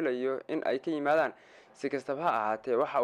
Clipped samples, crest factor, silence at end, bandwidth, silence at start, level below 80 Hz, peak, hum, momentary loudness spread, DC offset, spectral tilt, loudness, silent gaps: under 0.1%; 14 dB; 0 s; 10.5 kHz; 0 s; -78 dBFS; -16 dBFS; none; 7 LU; under 0.1%; -6 dB/octave; -31 LUFS; none